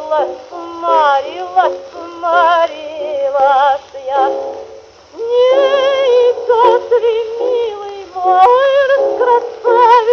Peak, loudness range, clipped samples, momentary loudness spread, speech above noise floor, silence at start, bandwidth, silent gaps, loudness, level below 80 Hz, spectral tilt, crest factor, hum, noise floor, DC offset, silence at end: 0 dBFS; 3 LU; under 0.1%; 13 LU; 24 dB; 0 s; 6.8 kHz; none; -12 LUFS; -58 dBFS; -3 dB/octave; 12 dB; none; -37 dBFS; under 0.1%; 0 s